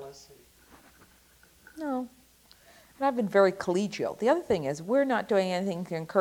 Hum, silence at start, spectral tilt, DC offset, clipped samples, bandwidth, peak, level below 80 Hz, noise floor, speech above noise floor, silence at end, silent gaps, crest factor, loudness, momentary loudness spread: none; 0 s; -6 dB/octave; under 0.1%; under 0.1%; 18 kHz; -10 dBFS; -66 dBFS; -60 dBFS; 33 dB; 0 s; none; 20 dB; -28 LUFS; 11 LU